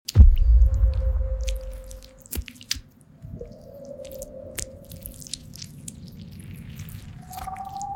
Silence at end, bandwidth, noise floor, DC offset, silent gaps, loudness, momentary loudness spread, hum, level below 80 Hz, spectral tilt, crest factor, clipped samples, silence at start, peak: 0 s; 17 kHz; -46 dBFS; under 0.1%; none; -25 LUFS; 22 LU; none; -24 dBFS; -5 dB/octave; 20 dB; under 0.1%; 0.1 s; -4 dBFS